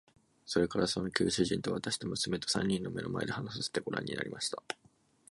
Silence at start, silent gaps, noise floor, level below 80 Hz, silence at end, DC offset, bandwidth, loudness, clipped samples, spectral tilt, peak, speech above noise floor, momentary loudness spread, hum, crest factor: 0.45 s; none; -65 dBFS; -60 dBFS; 0.55 s; under 0.1%; 11.5 kHz; -34 LUFS; under 0.1%; -4 dB/octave; -12 dBFS; 31 dB; 7 LU; none; 24 dB